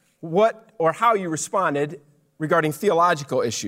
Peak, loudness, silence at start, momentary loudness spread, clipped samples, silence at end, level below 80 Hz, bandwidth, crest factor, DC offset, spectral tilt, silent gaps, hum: -6 dBFS; -21 LUFS; 0.25 s; 7 LU; under 0.1%; 0 s; -72 dBFS; 16 kHz; 16 dB; under 0.1%; -4.5 dB/octave; none; none